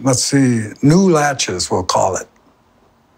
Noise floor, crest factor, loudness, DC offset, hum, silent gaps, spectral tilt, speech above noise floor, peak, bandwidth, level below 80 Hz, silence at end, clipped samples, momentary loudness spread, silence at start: -54 dBFS; 14 dB; -15 LUFS; under 0.1%; none; none; -4.5 dB/octave; 39 dB; -2 dBFS; 16 kHz; -48 dBFS; 0.95 s; under 0.1%; 6 LU; 0 s